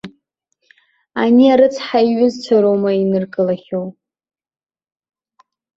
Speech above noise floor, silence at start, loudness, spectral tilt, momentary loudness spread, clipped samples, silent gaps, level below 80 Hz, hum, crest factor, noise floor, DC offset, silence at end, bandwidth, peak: 55 dB; 0.05 s; -15 LUFS; -7 dB/octave; 14 LU; under 0.1%; none; -62 dBFS; none; 16 dB; -69 dBFS; under 0.1%; 1.85 s; 7.6 kHz; -2 dBFS